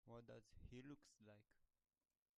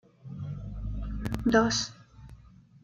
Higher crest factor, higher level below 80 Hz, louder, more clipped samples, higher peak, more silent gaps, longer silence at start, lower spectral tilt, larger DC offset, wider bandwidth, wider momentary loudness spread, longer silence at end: about the same, 18 dB vs 22 dB; second, -76 dBFS vs -42 dBFS; second, -63 LUFS vs -30 LUFS; neither; second, -48 dBFS vs -10 dBFS; neither; second, 0.05 s vs 0.25 s; first, -6 dB/octave vs -4.5 dB/octave; neither; second, 11 kHz vs 14.5 kHz; second, 4 LU vs 15 LU; first, 0.75 s vs 0.35 s